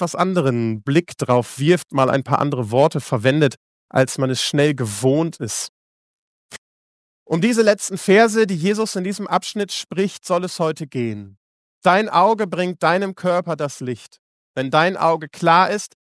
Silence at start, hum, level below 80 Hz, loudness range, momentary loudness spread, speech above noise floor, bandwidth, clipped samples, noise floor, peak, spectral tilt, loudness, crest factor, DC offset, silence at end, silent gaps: 0 s; none; -66 dBFS; 3 LU; 10 LU; over 72 dB; 11 kHz; under 0.1%; under -90 dBFS; 0 dBFS; -5 dB/octave; -19 LUFS; 18 dB; under 0.1%; 0.2 s; 3.57-3.88 s, 5.69-6.49 s, 6.58-7.26 s, 11.37-11.82 s, 14.19-14.54 s